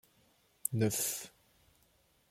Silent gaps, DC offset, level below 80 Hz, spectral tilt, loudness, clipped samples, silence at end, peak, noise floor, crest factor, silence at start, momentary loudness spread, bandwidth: none; under 0.1%; -72 dBFS; -4 dB/octave; -35 LUFS; under 0.1%; 1 s; -10 dBFS; -71 dBFS; 28 dB; 0.65 s; 12 LU; 16.5 kHz